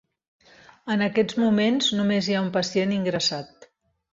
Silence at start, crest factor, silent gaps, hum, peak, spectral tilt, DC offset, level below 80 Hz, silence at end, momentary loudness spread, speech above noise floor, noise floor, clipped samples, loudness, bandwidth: 0.85 s; 16 dB; none; none; -10 dBFS; -4.5 dB/octave; under 0.1%; -64 dBFS; 0.5 s; 8 LU; 32 dB; -55 dBFS; under 0.1%; -23 LUFS; 7.8 kHz